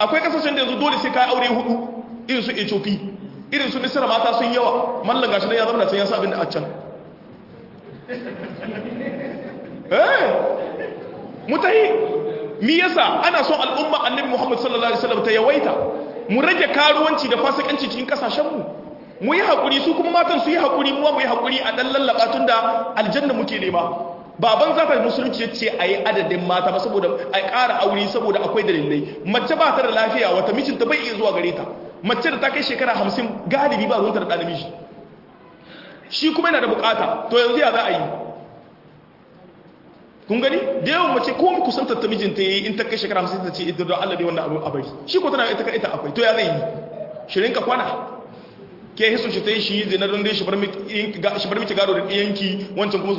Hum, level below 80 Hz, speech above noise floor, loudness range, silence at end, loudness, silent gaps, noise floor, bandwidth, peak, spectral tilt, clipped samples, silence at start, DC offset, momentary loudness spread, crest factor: none; -62 dBFS; 28 dB; 4 LU; 0 s; -19 LUFS; none; -48 dBFS; 5.8 kHz; -2 dBFS; -5.5 dB/octave; under 0.1%; 0 s; under 0.1%; 12 LU; 18 dB